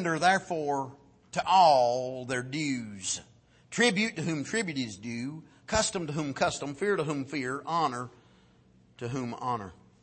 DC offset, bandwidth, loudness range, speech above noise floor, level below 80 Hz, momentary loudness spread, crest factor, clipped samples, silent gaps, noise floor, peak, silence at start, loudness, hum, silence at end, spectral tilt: under 0.1%; 8.8 kHz; 5 LU; 32 dB; -58 dBFS; 12 LU; 20 dB; under 0.1%; none; -61 dBFS; -10 dBFS; 0 s; -29 LUFS; none; 0.3 s; -4 dB/octave